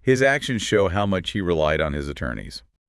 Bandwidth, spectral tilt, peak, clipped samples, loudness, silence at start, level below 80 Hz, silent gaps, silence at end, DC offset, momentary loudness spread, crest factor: 12 kHz; -5 dB/octave; -6 dBFS; under 0.1%; -22 LUFS; 0.05 s; -40 dBFS; none; 0.3 s; under 0.1%; 11 LU; 16 dB